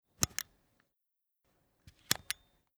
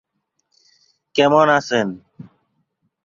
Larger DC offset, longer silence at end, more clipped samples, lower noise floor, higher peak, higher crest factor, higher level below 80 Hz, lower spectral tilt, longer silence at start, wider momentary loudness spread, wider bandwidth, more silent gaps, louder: neither; second, 0.45 s vs 0.8 s; neither; first, -85 dBFS vs -72 dBFS; second, -6 dBFS vs -2 dBFS; first, 36 dB vs 20 dB; about the same, -62 dBFS vs -64 dBFS; second, -1 dB/octave vs -5 dB/octave; second, 0.2 s vs 1.15 s; second, 8 LU vs 13 LU; first, over 20 kHz vs 7.6 kHz; neither; second, -36 LUFS vs -17 LUFS